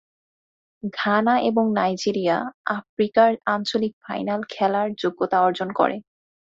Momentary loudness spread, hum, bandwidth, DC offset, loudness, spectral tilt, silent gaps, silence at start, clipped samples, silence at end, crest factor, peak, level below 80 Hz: 9 LU; none; 7.8 kHz; under 0.1%; -22 LUFS; -5.5 dB/octave; 2.54-2.64 s, 2.89-2.97 s, 3.93-4.01 s; 0.85 s; under 0.1%; 0.45 s; 18 dB; -4 dBFS; -66 dBFS